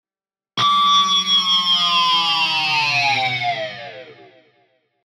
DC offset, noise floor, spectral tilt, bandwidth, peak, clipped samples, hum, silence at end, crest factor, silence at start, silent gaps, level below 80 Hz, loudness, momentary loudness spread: under 0.1%; under -90 dBFS; -1 dB/octave; 15.5 kHz; -6 dBFS; under 0.1%; none; 0.95 s; 12 dB; 0.55 s; none; -72 dBFS; -15 LUFS; 13 LU